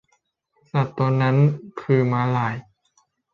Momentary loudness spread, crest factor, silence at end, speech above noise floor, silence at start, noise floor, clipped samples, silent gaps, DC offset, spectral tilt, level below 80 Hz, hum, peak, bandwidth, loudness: 9 LU; 16 dB; 0.75 s; 49 dB; 0.75 s; -69 dBFS; under 0.1%; none; under 0.1%; -9 dB/octave; -62 dBFS; none; -6 dBFS; 6.6 kHz; -21 LUFS